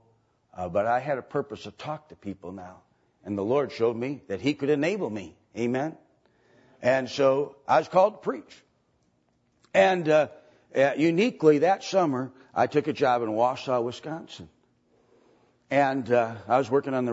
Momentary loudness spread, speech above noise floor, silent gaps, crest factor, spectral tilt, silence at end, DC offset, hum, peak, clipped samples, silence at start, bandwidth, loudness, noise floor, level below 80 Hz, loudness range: 16 LU; 44 dB; none; 20 dB; -6 dB/octave; 0 s; under 0.1%; none; -6 dBFS; under 0.1%; 0.55 s; 8 kHz; -25 LUFS; -69 dBFS; -70 dBFS; 7 LU